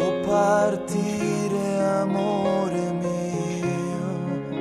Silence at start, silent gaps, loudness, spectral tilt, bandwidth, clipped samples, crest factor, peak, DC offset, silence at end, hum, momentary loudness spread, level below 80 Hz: 0 s; none; -24 LUFS; -6.5 dB/octave; 13 kHz; under 0.1%; 14 dB; -10 dBFS; under 0.1%; 0 s; none; 7 LU; -58 dBFS